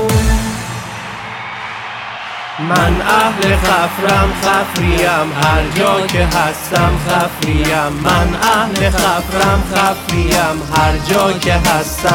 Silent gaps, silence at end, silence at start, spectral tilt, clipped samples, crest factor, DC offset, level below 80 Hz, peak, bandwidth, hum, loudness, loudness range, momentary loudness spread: none; 0 s; 0 s; -4.5 dB/octave; under 0.1%; 14 dB; under 0.1%; -24 dBFS; 0 dBFS; 18 kHz; none; -14 LUFS; 3 LU; 11 LU